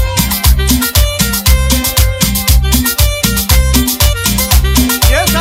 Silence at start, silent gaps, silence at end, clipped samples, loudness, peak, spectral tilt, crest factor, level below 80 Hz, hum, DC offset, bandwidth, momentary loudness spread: 0 s; none; 0 s; under 0.1%; -10 LUFS; 0 dBFS; -3.5 dB/octave; 10 dB; -12 dBFS; none; under 0.1%; 16.5 kHz; 2 LU